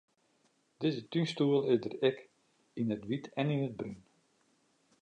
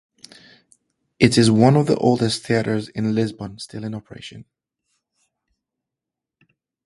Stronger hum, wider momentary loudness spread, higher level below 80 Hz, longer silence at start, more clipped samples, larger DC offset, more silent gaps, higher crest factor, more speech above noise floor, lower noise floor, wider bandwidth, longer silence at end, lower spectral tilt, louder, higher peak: neither; second, 15 LU vs 19 LU; second, -76 dBFS vs -54 dBFS; second, 0.8 s vs 1.2 s; neither; neither; neither; about the same, 20 dB vs 22 dB; second, 40 dB vs 67 dB; second, -73 dBFS vs -86 dBFS; second, 9.6 kHz vs 11.5 kHz; second, 1.05 s vs 2.45 s; first, -7.5 dB/octave vs -6 dB/octave; second, -33 LUFS vs -18 LUFS; second, -16 dBFS vs 0 dBFS